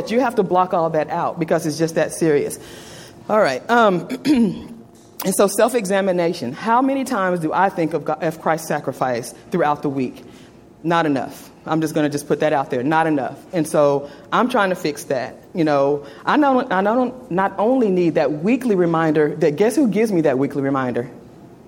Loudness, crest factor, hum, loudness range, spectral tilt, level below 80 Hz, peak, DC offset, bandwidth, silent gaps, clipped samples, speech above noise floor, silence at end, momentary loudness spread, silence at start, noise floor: -19 LUFS; 18 dB; none; 4 LU; -5.5 dB/octave; -58 dBFS; -2 dBFS; under 0.1%; 16.5 kHz; none; under 0.1%; 25 dB; 0.15 s; 8 LU; 0 s; -44 dBFS